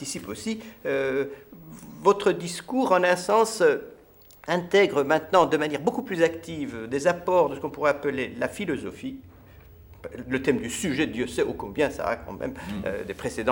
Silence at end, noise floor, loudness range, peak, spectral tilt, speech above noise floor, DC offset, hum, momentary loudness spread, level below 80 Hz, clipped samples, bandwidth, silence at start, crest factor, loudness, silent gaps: 0 s; -52 dBFS; 6 LU; -6 dBFS; -4.5 dB/octave; 27 dB; under 0.1%; none; 14 LU; -54 dBFS; under 0.1%; 17 kHz; 0 s; 20 dB; -25 LUFS; none